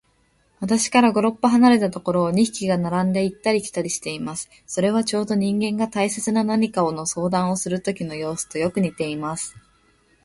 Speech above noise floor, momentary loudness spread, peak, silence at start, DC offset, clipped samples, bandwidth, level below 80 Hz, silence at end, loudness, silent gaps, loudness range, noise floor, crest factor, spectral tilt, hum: 42 dB; 11 LU; -2 dBFS; 0.6 s; under 0.1%; under 0.1%; 12 kHz; -58 dBFS; 0.65 s; -21 LUFS; none; 4 LU; -63 dBFS; 18 dB; -5 dB/octave; none